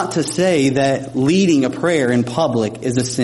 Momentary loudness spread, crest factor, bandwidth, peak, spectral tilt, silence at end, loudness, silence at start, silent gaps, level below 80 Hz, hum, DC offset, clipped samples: 5 LU; 12 dB; 11.5 kHz; -4 dBFS; -5.5 dB/octave; 0 s; -17 LUFS; 0 s; none; -54 dBFS; none; under 0.1%; under 0.1%